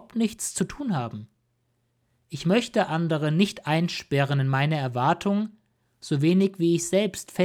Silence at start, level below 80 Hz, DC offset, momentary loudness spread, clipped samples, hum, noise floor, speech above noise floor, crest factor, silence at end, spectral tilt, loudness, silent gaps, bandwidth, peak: 0.15 s; -60 dBFS; under 0.1%; 8 LU; under 0.1%; none; -72 dBFS; 47 dB; 18 dB; 0 s; -5.5 dB/octave; -25 LUFS; none; 16 kHz; -8 dBFS